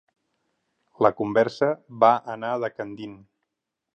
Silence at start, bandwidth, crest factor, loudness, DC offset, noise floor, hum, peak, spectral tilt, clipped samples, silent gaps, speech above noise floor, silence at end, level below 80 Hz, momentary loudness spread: 1 s; 8.2 kHz; 22 dB; -23 LUFS; under 0.1%; -84 dBFS; none; -4 dBFS; -7 dB/octave; under 0.1%; none; 61 dB; 0.8 s; -68 dBFS; 16 LU